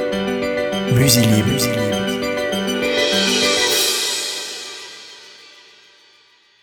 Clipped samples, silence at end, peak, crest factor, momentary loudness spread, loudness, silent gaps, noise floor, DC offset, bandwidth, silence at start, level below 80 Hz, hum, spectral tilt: under 0.1%; 1.2 s; 0 dBFS; 20 dB; 17 LU; -17 LUFS; none; -53 dBFS; under 0.1%; over 20 kHz; 0 s; -46 dBFS; none; -3.5 dB/octave